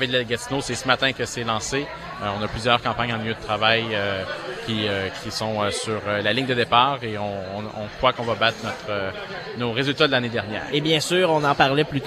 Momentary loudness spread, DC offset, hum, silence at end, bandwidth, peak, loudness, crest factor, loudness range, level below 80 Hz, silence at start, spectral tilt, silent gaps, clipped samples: 10 LU; under 0.1%; none; 0 s; 14.5 kHz; 0 dBFS; -23 LUFS; 22 dB; 1 LU; -50 dBFS; 0 s; -4 dB/octave; none; under 0.1%